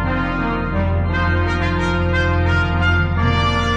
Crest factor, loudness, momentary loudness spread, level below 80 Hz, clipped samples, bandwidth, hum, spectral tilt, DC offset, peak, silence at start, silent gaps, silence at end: 14 dB; -18 LUFS; 3 LU; -26 dBFS; under 0.1%; 7.8 kHz; none; -7 dB/octave; under 0.1%; -4 dBFS; 0 s; none; 0 s